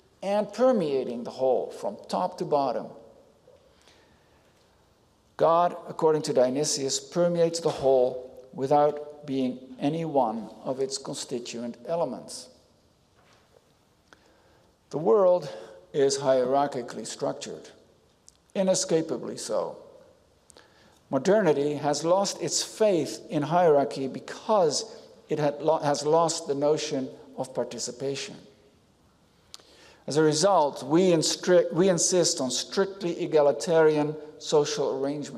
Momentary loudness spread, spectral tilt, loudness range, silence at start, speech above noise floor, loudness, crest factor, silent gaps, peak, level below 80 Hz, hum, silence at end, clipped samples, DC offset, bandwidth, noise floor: 13 LU; -4 dB/octave; 10 LU; 0.2 s; 38 dB; -26 LUFS; 16 dB; none; -12 dBFS; -70 dBFS; none; 0 s; under 0.1%; under 0.1%; 14 kHz; -63 dBFS